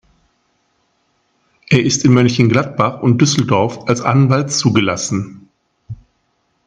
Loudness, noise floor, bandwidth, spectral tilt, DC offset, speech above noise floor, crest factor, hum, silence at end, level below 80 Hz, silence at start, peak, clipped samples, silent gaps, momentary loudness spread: -14 LUFS; -64 dBFS; 10 kHz; -5 dB/octave; under 0.1%; 51 dB; 16 dB; none; 0.75 s; -52 dBFS; 1.7 s; 0 dBFS; under 0.1%; none; 18 LU